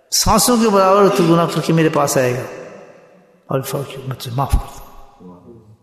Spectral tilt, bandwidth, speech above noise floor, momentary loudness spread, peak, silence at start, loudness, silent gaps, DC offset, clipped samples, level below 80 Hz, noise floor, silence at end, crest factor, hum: -4.5 dB/octave; 14 kHz; 33 dB; 16 LU; -2 dBFS; 0.1 s; -15 LUFS; none; under 0.1%; under 0.1%; -32 dBFS; -48 dBFS; 0.3 s; 16 dB; none